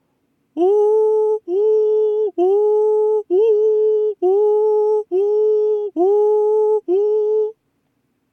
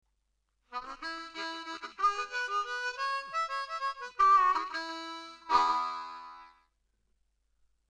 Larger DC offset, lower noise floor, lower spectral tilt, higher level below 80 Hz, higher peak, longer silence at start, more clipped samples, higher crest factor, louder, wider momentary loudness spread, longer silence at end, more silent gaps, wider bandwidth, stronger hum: neither; second, -67 dBFS vs -78 dBFS; first, -6.5 dB/octave vs -0.5 dB/octave; second, -86 dBFS vs -68 dBFS; first, -8 dBFS vs -12 dBFS; second, 0.55 s vs 0.7 s; neither; second, 10 dB vs 20 dB; first, -17 LUFS vs -31 LUFS; second, 4 LU vs 18 LU; second, 0.8 s vs 1.4 s; neither; second, 3.3 kHz vs 10.5 kHz; neither